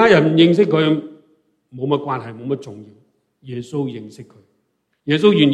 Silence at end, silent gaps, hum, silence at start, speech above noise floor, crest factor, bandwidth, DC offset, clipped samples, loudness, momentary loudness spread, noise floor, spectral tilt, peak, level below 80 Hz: 0 s; none; none; 0 s; 52 dB; 18 dB; 9.6 kHz; under 0.1%; under 0.1%; -17 LUFS; 21 LU; -68 dBFS; -7 dB/octave; 0 dBFS; -62 dBFS